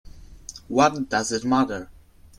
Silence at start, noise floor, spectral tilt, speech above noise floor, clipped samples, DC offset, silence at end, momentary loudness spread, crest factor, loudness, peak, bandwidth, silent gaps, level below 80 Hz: 0.05 s; -43 dBFS; -4 dB/octave; 21 dB; under 0.1%; under 0.1%; 0.45 s; 20 LU; 20 dB; -22 LUFS; -4 dBFS; 12.5 kHz; none; -50 dBFS